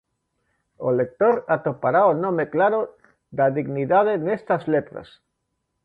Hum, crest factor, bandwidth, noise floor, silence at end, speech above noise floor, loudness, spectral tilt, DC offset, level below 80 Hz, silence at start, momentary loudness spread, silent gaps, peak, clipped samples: none; 16 dB; 4.8 kHz; -76 dBFS; 0.8 s; 55 dB; -21 LUFS; -10 dB/octave; under 0.1%; -64 dBFS; 0.8 s; 10 LU; none; -6 dBFS; under 0.1%